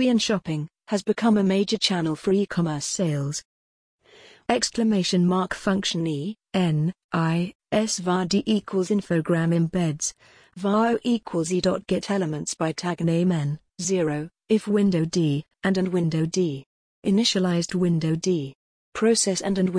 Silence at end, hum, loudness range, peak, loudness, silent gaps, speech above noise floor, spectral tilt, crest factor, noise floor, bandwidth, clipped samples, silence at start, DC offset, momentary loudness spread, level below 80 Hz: 0 s; none; 2 LU; -6 dBFS; -24 LUFS; 3.45-3.99 s, 7.04-7.09 s, 7.55-7.59 s, 16.66-17.02 s, 18.55-18.92 s; 29 dB; -5 dB/octave; 18 dB; -52 dBFS; 10.5 kHz; under 0.1%; 0 s; under 0.1%; 7 LU; -58 dBFS